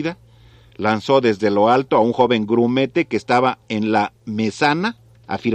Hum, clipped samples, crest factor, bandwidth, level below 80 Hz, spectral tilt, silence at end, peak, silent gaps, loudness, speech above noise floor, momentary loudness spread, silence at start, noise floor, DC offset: none; under 0.1%; 16 dB; 9.6 kHz; -56 dBFS; -6 dB/octave; 0 s; -2 dBFS; none; -18 LUFS; 30 dB; 8 LU; 0 s; -48 dBFS; under 0.1%